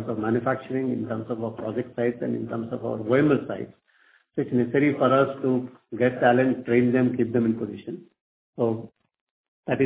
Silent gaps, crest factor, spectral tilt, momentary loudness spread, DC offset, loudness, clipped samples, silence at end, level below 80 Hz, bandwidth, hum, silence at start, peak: 8.21-8.53 s, 9.21-9.63 s; 18 dB; -11.5 dB/octave; 14 LU; under 0.1%; -25 LUFS; under 0.1%; 0 s; -62 dBFS; 4 kHz; none; 0 s; -6 dBFS